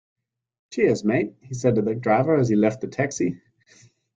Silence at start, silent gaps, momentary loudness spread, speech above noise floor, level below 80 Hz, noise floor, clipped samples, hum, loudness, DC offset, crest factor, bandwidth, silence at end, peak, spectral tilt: 0.7 s; none; 8 LU; 34 dB; -60 dBFS; -56 dBFS; under 0.1%; none; -22 LUFS; under 0.1%; 18 dB; 9.2 kHz; 0.8 s; -6 dBFS; -7 dB/octave